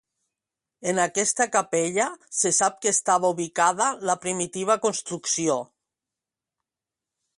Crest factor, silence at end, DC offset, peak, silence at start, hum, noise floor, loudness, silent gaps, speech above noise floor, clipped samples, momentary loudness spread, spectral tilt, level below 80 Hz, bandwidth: 20 dB; 1.75 s; under 0.1%; -6 dBFS; 0.8 s; none; -89 dBFS; -23 LUFS; none; 65 dB; under 0.1%; 7 LU; -2.5 dB/octave; -72 dBFS; 11.5 kHz